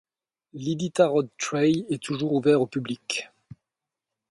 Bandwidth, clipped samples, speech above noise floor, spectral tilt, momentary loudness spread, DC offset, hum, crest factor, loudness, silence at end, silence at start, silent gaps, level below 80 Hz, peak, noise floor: 11.5 kHz; under 0.1%; 63 dB; -5.5 dB/octave; 10 LU; under 0.1%; none; 20 dB; -25 LUFS; 1.05 s; 0.55 s; none; -68 dBFS; -6 dBFS; -87 dBFS